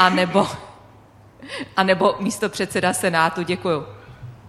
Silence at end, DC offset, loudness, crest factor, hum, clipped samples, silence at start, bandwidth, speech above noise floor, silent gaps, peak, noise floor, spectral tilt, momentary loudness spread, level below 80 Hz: 0 s; under 0.1%; -20 LUFS; 22 dB; none; under 0.1%; 0 s; 13.5 kHz; 28 dB; none; 0 dBFS; -48 dBFS; -4.5 dB/octave; 18 LU; -56 dBFS